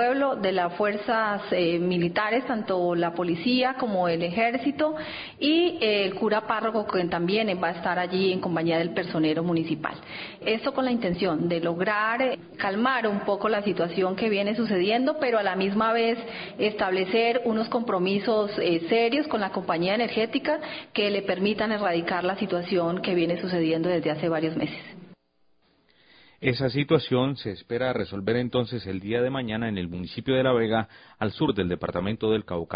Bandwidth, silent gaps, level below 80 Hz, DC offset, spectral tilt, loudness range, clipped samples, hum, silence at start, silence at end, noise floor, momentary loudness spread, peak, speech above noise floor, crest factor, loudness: 5.2 kHz; none; -56 dBFS; under 0.1%; -10.5 dB/octave; 3 LU; under 0.1%; none; 0 s; 0 s; -67 dBFS; 6 LU; -8 dBFS; 42 dB; 18 dB; -26 LUFS